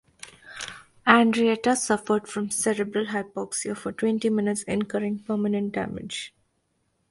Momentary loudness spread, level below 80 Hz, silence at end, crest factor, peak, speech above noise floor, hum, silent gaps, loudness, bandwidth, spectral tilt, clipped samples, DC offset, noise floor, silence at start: 17 LU; -62 dBFS; 0.8 s; 26 dB; 0 dBFS; 47 dB; none; none; -25 LUFS; 11.5 kHz; -4 dB/octave; under 0.1%; under 0.1%; -72 dBFS; 0.25 s